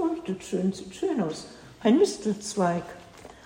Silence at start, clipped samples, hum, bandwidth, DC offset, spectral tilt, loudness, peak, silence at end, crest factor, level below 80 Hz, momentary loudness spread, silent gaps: 0 s; under 0.1%; none; 16 kHz; under 0.1%; -5.5 dB/octave; -27 LUFS; -10 dBFS; 0.1 s; 18 dB; -62 dBFS; 21 LU; none